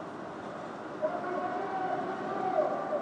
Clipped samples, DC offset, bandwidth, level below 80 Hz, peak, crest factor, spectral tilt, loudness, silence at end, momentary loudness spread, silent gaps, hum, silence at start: under 0.1%; under 0.1%; 9.8 kHz; -76 dBFS; -16 dBFS; 16 dB; -6.5 dB/octave; -34 LUFS; 0 s; 10 LU; none; none; 0 s